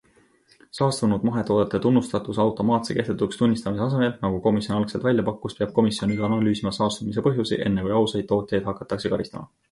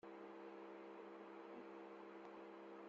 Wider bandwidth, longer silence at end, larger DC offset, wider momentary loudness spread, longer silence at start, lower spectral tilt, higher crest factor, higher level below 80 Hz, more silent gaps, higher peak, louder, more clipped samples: first, 11.5 kHz vs 7.4 kHz; first, 0.25 s vs 0 s; neither; first, 6 LU vs 1 LU; first, 0.75 s vs 0.05 s; first, -6.5 dB/octave vs -4 dB/octave; about the same, 16 dB vs 12 dB; first, -52 dBFS vs under -90 dBFS; neither; first, -6 dBFS vs -44 dBFS; first, -23 LUFS vs -57 LUFS; neither